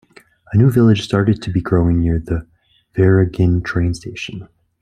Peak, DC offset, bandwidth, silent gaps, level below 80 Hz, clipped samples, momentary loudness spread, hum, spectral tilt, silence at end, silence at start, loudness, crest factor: -2 dBFS; under 0.1%; 14 kHz; none; -36 dBFS; under 0.1%; 14 LU; none; -8 dB/octave; 0.35 s; 0.5 s; -16 LUFS; 14 dB